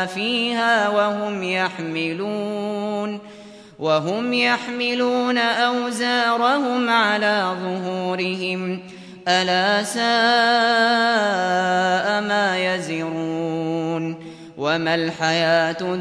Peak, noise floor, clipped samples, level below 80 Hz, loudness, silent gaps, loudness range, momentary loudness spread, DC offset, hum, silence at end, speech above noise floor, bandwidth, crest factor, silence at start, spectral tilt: -6 dBFS; -42 dBFS; under 0.1%; -68 dBFS; -20 LUFS; none; 5 LU; 9 LU; under 0.1%; none; 0 s; 21 dB; 11 kHz; 16 dB; 0 s; -4 dB/octave